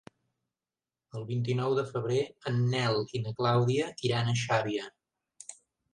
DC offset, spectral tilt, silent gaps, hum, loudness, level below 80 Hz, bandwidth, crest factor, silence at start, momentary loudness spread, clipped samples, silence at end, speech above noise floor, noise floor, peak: under 0.1%; -6 dB/octave; none; none; -30 LUFS; -68 dBFS; 10 kHz; 18 dB; 1.15 s; 19 LU; under 0.1%; 0.4 s; over 61 dB; under -90 dBFS; -14 dBFS